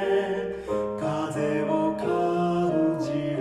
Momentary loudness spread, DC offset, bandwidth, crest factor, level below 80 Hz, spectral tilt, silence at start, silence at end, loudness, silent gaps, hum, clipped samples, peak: 5 LU; under 0.1%; 12 kHz; 14 dB; -56 dBFS; -7 dB/octave; 0 s; 0 s; -26 LUFS; none; none; under 0.1%; -12 dBFS